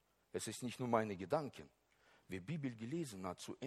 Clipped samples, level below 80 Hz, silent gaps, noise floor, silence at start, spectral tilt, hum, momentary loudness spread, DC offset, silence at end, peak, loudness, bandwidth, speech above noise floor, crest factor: under 0.1%; -78 dBFS; none; -71 dBFS; 0.35 s; -5.5 dB/octave; none; 12 LU; under 0.1%; 0 s; -20 dBFS; -43 LUFS; 15 kHz; 28 dB; 24 dB